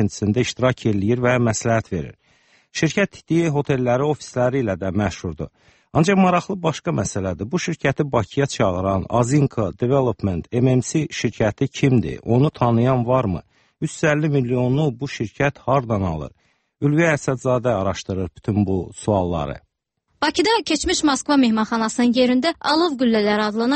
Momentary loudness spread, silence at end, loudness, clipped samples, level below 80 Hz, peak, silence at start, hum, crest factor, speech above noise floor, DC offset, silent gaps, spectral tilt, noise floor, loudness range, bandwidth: 8 LU; 0 s; -20 LUFS; under 0.1%; -46 dBFS; -4 dBFS; 0 s; none; 16 dB; 52 dB; under 0.1%; none; -6 dB/octave; -72 dBFS; 3 LU; 8.8 kHz